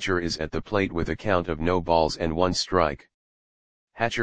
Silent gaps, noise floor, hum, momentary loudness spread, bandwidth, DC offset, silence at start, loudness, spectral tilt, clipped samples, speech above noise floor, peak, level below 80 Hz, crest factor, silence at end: 3.14-3.88 s; under -90 dBFS; none; 6 LU; 10 kHz; 0.8%; 0 s; -25 LUFS; -5 dB/octave; under 0.1%; over 65 dB; -4 dBFS; -44 dBFS; 22 dB; 0 s